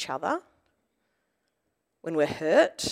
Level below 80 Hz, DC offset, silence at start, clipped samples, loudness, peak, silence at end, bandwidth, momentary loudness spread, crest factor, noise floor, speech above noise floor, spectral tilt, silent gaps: -68 dBFS; under 0.1%; 0 s; under 0.1%; -26 LUFS; -10 dBFS; 0 s; 15.5 kHz; 11 LU; 20 dB; -79 dBFS; 53 dB; -3.5 dB/octave; none